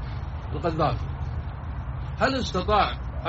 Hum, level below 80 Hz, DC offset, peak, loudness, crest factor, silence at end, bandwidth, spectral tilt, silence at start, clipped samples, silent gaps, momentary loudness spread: none; -34 dBFS; under 0.1%; -8 dBFS; -27 LUFS; 18 dB; 0 s; 8 kHz; -4.5 dB/octave; 0 s; under 0.1%; none; 11 LU